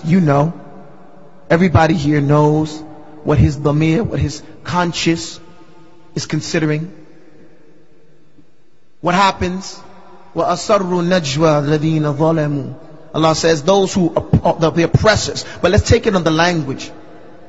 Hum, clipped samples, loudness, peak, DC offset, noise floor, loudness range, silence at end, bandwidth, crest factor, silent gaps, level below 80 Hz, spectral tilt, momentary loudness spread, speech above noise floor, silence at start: none; under 0.1%; -15 LUFS; 0 dBFS; 1%; -57 dBFS; 7 LU; 0.3 s; 8 kHz; 16 dB; none; -36 dBFS; -6 dB/octave; 15 LU; 43 dB; 0 s